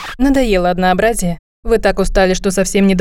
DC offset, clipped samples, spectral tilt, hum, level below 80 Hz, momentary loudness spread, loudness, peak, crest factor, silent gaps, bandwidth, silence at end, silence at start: under 0.1%; under 0.1%; -5 dB/octave; none; -24 dBFS; 5 LU; -14 LUFS; -2 dBFS; 12 dB; 1.39-1.63 s; 17 kHz; 0 s; 0 s